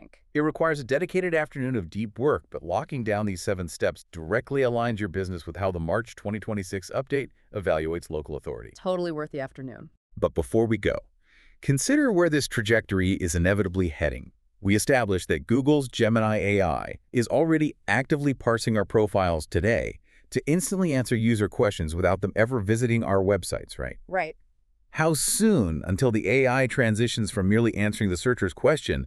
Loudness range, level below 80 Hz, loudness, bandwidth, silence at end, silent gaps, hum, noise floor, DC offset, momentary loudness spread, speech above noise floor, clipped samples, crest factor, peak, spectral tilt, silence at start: 6 LU; -46 dBFS; -25 LUFS; 13.5 kHz; 0 s; 9.97-10.10 s; none; -62 dBFS; under 0.1%; 10 LU; 37 dB; under 0.1%; 18 dB; -8 dBFS; -5.5 dB/octave; 0.35 s